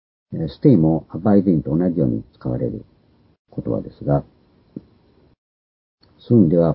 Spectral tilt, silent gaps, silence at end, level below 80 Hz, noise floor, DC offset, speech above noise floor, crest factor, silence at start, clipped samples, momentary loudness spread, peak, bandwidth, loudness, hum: -14.5 dB/octave; 3.39-3.45 s, 5.38-5.98 s; 0 s; -44 dBFS; -55 dBFS; under 0.1%; 37 dB; 20 dB; 0.3 s; under 0.1%; 20 LU; 0 dBFS; 5.4 kHz; -19 LUFS; none